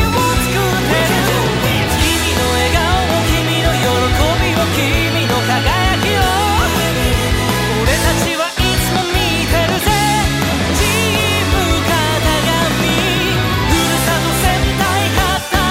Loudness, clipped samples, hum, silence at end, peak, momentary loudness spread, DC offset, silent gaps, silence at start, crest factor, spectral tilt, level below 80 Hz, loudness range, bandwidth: -14 LUFS; under 0.1%; none; 0 s; 0 dBFS; 2 LU; under 0.1%; none; 0 s; 14 dB; -4 dB/octave; -24 dBFS; 0 LU; 16.5 kHz